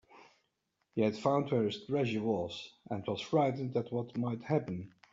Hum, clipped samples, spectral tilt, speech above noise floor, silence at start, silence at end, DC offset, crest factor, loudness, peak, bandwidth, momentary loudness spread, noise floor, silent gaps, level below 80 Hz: none; under 0.1%; -6 dB/octave; 48 dB; 0.15 s; 0.25 s; under 0.1%; 20 dB; -34 LUFS; -16 dBFS; 7.8 kHz; 11 LU; -81 dBFS; none; -74 dBFS